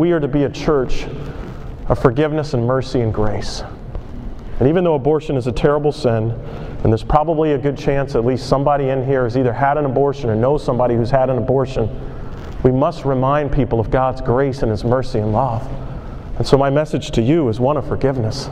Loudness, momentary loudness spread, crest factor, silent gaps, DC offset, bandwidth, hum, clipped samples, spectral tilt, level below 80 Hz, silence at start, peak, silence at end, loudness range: -17 LUFS; 14 LU; 16 dB; none; under 0.1%; 10.5 kHz; none; under 0.1%; -7.5 dB/octave; -30 dBFS; 0 s; 0 dBFS; 0 s; 2 LU